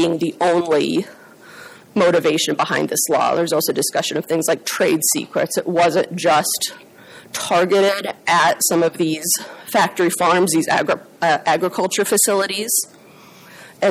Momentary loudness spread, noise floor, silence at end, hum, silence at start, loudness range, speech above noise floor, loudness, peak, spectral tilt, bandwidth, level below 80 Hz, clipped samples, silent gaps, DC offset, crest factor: 6 LU; -44 dBFS; 0 s; none; 0 s; 2 LU; 26 dB; -18 LUFS; -6 dBFS; -3 dB/octave; 16.5 kHz; -64 dBFS; under 0.1%; none; under 0.1%; 14 dB